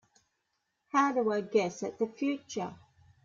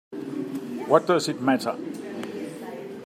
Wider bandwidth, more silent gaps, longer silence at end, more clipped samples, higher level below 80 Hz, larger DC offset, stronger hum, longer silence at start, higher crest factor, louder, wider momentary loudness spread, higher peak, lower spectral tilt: second, 7.6 kHz vs 15.5 kHz; neither; first, 0.5 s vs 0 s; neither; about the same, -76 dBFS vs -76 dBFS; neither; neither; first, 0.95 s vs 0.1 s; about the same, 20 dB vs 24 dB; second, -31 LUFS vs -26 LUFS; second, 11 LU vs 14 LU; second, -14 dBFS vs -4 dBFS; about the same, -5 dB/octave vs -5 dB/octave